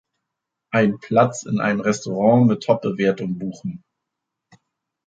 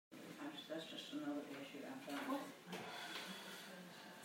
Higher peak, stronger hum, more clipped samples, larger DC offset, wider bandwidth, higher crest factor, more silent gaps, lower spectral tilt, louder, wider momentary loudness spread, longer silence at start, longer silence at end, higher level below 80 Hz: first, -2 dBFS vs -32 dBFS; neither; neither; neither; second, 9 kHz vs 16 kHz; about the same, 18 dB vs 18 dB; neither; first, -6.5 dB/octave vs -3.5 dB/octave; first, -20 LUFS vs -50 LUFS; first, 13 LU vs 8 LU; first, 0.7 s vs 0.1 s; first, 1.3 s vs 0 s; first, -62 dBFS vs under -90 dBFS